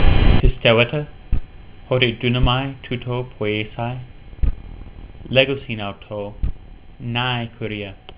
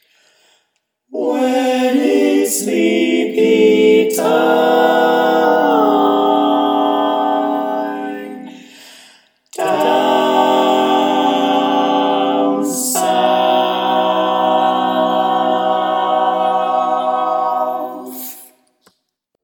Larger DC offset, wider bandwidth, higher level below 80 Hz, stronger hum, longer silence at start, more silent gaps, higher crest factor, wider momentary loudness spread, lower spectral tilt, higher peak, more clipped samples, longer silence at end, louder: neither; second, 4 kHz vs 19 kHz; first, -26 dBFS vs -74 dBFS; neither; second, 0 s vs 1.1 s; neither; about the same, 18 dB vs 14 dB; first, 16 LU vs 9 LU; first, -10 dB/octave vs -3.5 dB/octave; about the same, 0 dBFS vs 0 dBFS; neither; second, 0.05 s vs 1 s; second, -21 LUFS vs -14 LUFS